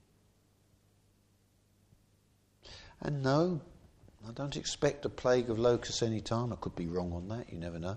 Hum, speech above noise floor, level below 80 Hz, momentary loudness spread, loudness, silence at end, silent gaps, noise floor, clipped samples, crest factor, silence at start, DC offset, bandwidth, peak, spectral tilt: 50 Hz at -70 dBFS; 36 dB; -58 dBFS; 14 LU; -34 LUFS; 0 s; none; -69 dBFS; under 0.1%; 20 dB; 2.65 s; under 0.1%; 10 kHz; -16 dBFS; -5.5 dB/octave